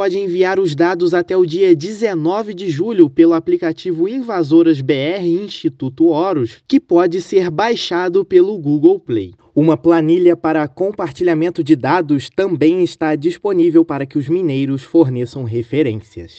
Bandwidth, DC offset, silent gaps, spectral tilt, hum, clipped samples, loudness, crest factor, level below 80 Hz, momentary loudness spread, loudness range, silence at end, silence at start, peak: 8 kHz; under 0.1%; none; -7.5 dB/octave; none; under 0.1%; -15 LUFS; 14 dB; -58 dBFS; 8 LU; 2 LU; 0.1 s; 0 s; 0 dBFS